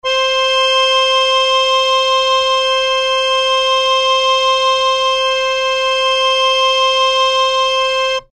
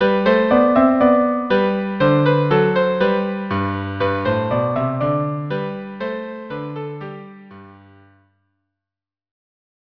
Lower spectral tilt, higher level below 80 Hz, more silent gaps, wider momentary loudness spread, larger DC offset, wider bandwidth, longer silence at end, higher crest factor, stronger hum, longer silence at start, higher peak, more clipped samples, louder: second, 2 dB/octave vs -9.5 dB/octave; about the same, -48 dBFS vs -52 dBFS; neither; second, 3 LU vs 15 LU; neither; first, 12.5 kHz vs 5.4 kHz; second, 0.1 s vs 2.25 s; second, 10 dB vs 18 dB; neither; about the same, 0.05 s vs 0 s; about the same, -2 dBFS vs -2 dBFS; neither; first, -12 LUFS vs -18 LUFS